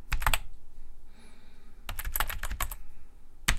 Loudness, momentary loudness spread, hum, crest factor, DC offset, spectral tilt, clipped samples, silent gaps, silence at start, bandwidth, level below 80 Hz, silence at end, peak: -34 LUFS; 26 LU; none; 26 dB; under 0.1%; -2 dB/octave; under 0.1%; none; 0 s; 16.5 kHz; -36 dBFS; 0 s; -6 dBFS